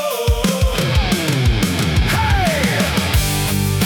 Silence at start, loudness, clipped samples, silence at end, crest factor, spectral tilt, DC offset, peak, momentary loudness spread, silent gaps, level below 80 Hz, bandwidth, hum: 0 s; -17 LUFS; under 0.1%; 0 s; 12 dB; -4.5 dB/octave; under 0.1%; -4 dBFS; 2 LU; none; -22 dBFS; 19 kHz; none